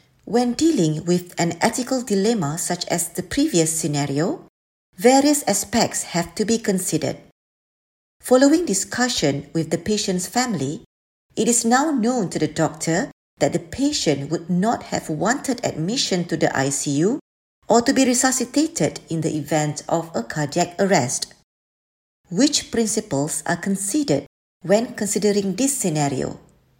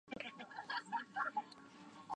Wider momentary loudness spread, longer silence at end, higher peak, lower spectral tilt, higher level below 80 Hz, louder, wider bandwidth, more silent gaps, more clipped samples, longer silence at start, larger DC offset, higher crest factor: second, 8 LU vs 16 LU; first, 0.4 s vs 0 s; first, -2 dBFS vs -26 dBFS; about the same, -4 dB/octave vs -3.5 dB/octave; first, -54 dBFS vs -84 dBFS; first, -21 LUFS vs -44 LUFS; first, 16.5 kHz vs 10 kHz; first, 4.49-4.93 s, 7.32-8.20 s, 10.86-11.30 s, 13.13-13.37 s, 17.21-17.62 s, 21.43-22.24 s, 24.27-24.60 s vs none; neither; first, 0.25 s vs 0.05 s; neither; about the same, 20 dB vs 20 dB